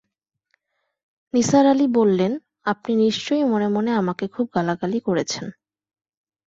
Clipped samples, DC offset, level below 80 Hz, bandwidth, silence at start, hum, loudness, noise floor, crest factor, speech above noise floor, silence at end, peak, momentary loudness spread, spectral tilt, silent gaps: under 0.1%; under 0.1%; -62 dBFS; 8 kHz; 1.35 s; none; -21 LUFS; -79 dBFS; 18 dB; 59 dB; 0.95 s; -4 dBFS; 10 LU; -5.5 dB/octave; none